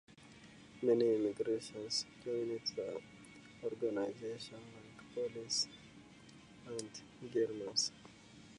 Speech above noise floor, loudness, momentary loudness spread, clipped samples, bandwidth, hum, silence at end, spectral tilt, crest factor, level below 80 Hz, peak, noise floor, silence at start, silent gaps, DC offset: 20 dB; -39 LUFS; 23 LU; under 0.1%; 11 kHz; none; 0 s; -3.5 dB/octave; 20 dB; -76 dBFS; -20 dBFS; -59 dBFS; 0.1 s; none; under 0.1%